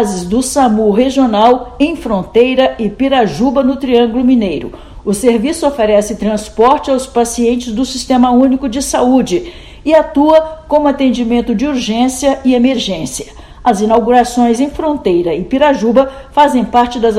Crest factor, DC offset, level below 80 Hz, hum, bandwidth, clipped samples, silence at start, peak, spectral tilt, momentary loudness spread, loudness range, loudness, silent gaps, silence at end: 12 dB; under 0.1%; -36 dBFS; none; 13.5 kHz; 0.5%; 0 s; 0 dBFS; -5 dB/octave; 7 LU; 2 LU; -12 LUFS; none; 0 s